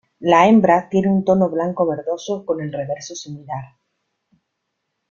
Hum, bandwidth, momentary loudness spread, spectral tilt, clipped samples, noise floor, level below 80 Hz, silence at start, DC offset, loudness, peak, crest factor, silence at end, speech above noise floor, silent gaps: none; 7.4 kHz; 18 LU; -6.5 dB/octave; under 0.1%; -76 dBFS; -58 dBFS; 0.2 s; under 0.1%; -17 LUFS; -2 dBFS; 18 dB; 1.45 s; 58 dB; none